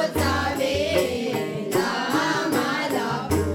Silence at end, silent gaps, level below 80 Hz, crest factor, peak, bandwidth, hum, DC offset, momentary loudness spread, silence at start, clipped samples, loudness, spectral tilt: 0 s; none; -44 dBFS; 14 dB; -8 dBFS; 18 kHz; none; under 0.1%; 3 LU; 0 s; under 0.1%; -23 LUFS; -4.5 dB/octave